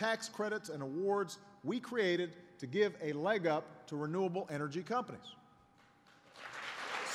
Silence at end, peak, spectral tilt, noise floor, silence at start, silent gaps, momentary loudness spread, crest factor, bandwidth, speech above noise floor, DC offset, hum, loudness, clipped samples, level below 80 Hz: 0 s; -20 dBFS; -5 dB/octave; -66 dBFS; 0 s; none; 12 LU; 20 dB; 14 kHz; 29 dB; under 0.1%; none; -38 LUFS; under 0.1%; -84 dBFS